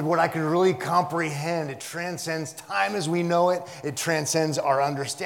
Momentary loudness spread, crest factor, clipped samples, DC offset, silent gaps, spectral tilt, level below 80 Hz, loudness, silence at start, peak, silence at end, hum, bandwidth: 8 LU; 18 dB; under 0.1%; under 0.1%; none; -4.5 dB/octave; -74 dBFS; -25 LUFS; 0 s; -6 dBFS; 0 s; none; 18 kHz